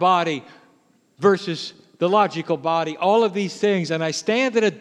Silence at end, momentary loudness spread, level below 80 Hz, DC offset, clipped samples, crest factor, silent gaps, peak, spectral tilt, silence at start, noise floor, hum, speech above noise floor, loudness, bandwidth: 0 s; 8 LU; -78 dBFS; under 0.1%; under 0.1%; 18 dB; none; -2 dBFS; -5 dB/octave; 0 s; -59 dBFS; none; 39 dB; -21 LUFS; 10.5 kHz